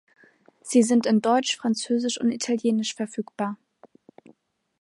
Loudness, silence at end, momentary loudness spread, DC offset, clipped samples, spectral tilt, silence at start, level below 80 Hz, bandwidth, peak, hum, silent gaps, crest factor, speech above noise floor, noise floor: -24 LUFS; 1.25 s; 11 LU; under 0.1%; under 0.1%; -4 dB/octave; 0.65 s; -78 dBFS; 11.5 kHz; -6 dBFS; none; none; 18 dB; 36 dB; -60 dBFS